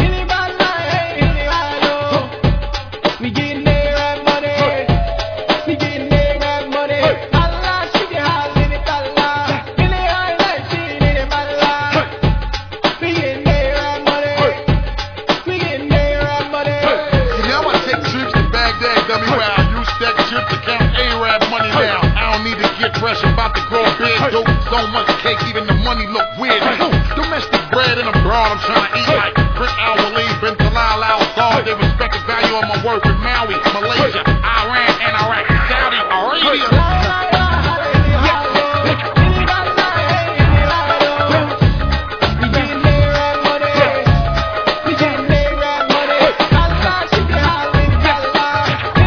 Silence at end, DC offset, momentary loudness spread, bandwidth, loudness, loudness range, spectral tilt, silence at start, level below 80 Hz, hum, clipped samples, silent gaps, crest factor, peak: 0 s; under 0.1%; 5 LU; 5.4 kHz; -15 LUFS; 3 LU; -6 dB/octave; 0 s; -24 dBFS; none; under 0.1%; none; 14 dB; 0 dBFS